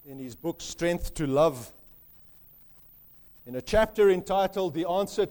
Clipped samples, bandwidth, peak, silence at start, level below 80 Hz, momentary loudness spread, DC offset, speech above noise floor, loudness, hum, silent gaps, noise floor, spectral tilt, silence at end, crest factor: under 0.1%; over 20 kHz; -12 dBFS; 0.05 s; -46 dBFS; 16 LU; under 0.1%; 27 dB; -27 LUFS; none; none; -54 dBFS; -5 dB/octave; 0 s; 18 dB